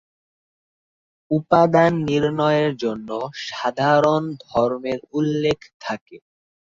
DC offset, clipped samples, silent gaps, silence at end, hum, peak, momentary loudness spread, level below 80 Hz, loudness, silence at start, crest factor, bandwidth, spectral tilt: under 0.1%; under 0.1%; 5.74-5.80 s, 6.01-6.06 s; 0.6 s; none; -2 dBFS; 13 LU; -56 dBFS; -20 LUFS; 1.3 s; 20 dB; 7.8 kHz; -6.5 dB/octave